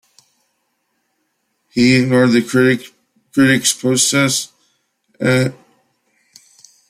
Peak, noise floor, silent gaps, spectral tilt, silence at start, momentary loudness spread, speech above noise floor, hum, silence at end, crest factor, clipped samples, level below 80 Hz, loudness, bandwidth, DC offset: -2 dBFS; -68 dBFS; none; -4 dB/octave; 1.75 s; 10 LU; 55 dB; none; 1.35 s; 16 dB; under 0.1%; -58 dBFS; -14 LUFS; 14.5 kHz; under 0.1%